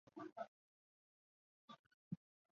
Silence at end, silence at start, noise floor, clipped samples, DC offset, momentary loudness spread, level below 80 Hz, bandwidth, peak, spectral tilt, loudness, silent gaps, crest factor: 0.4 s; 0.15 s; under -90 dBFS; under 0.1%; under 0.1%; 12 LU; under -90 dBFS; 7 kHz; -36 dBFS; -6.5 dB/octave; -57 LUFS; 0.32-0.36 s, 0.48-1.68 s, 1.79-2.11 s; 22 dB